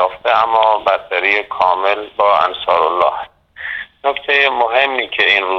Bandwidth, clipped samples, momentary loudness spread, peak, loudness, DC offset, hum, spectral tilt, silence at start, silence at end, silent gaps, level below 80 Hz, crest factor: 7.2 kHz; under 0.1%; 12 LU; 0 dBFS; -14 LUFS; under 0.1%; none; -3.5 dB/octave; 0 s; 0 s; none; -56 dBFS; 14 dB